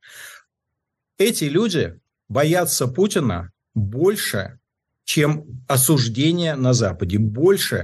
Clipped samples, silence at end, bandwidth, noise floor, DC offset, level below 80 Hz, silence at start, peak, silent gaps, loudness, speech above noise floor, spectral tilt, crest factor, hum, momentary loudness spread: under 0.1%; 0 s; 13 kHz; -80 dBFS; under 0.1%; -52 dBFS; 0.1 s; -6 dBFS; none; -20 LUFS; 61 dB; -5 dB/octave; 14 dB; none; 12 LU